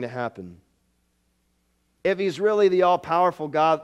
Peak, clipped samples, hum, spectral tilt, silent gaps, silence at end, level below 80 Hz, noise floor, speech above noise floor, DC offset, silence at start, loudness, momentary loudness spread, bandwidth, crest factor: -8 dBFS; under 0.1%; none; -6 dB/octave; none; 0 s; -66 dBFS; -69 dBFS; 47 dB; under 0.1%; 0 s; -22 LUFS; 14 LU; 10 kHz; 16 dB